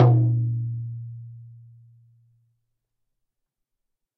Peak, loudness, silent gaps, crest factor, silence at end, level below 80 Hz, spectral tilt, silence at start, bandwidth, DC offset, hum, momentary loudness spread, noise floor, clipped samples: -4 dBFS; -24 LUFS; none; 22 dB; 2.65 s; -62 dBFS; -10.5 dB/octave; 0 s; 2.3 kHz; under 0.1%; none; 25 LU; -81 dBFS; under 0.1%